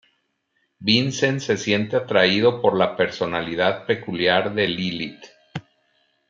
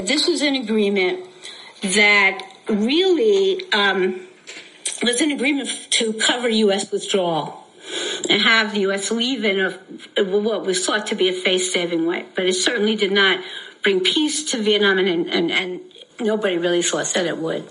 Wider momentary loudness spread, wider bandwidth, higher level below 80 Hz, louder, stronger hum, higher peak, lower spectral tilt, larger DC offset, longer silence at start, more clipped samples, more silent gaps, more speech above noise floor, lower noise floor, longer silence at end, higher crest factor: about the same, 13 LU vs 12 LU; second, 7.6 kHz vs 11.5 kHz; first, -62 dBFS vs -70 dBFS; about the same, -21 LUFS vs -19 LUFS; neither; about the same, -2 dBFS vs -4 dBFS; first, -4.5 dB/octave vs -2.5 dB/octave; neither; first, 0.8 s vs 0 s; neither; neither; first, 50 dB vs 21 dB; first, -71 dBFS vs -40 dBFS; first, 0.7 s vs 0 s; about the same, 20 dB vs 16 dB